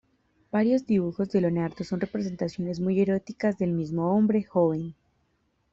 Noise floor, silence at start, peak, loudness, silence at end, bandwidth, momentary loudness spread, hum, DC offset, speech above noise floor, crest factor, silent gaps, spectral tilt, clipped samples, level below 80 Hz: -71 dBFS; 0.55 s; -10 dBFS; -26 LUFS; 0.8 s; 7.6 kHz; 7 LU; none; under 0.1%; 46 dB; 16 dB; none; -8.5 dB/octave; under 0.1%; -62 dBFS